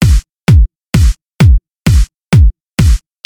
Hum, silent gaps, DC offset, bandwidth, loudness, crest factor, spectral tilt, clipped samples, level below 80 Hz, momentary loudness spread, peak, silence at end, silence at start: none; none; under 0.1%; 18 kHz; -11 LUFS; 8 dB; -6.5 dB/octave; under 0.1%; -12 dBFS; 4 LU; 0 dBFS; 0.3 s; 0 s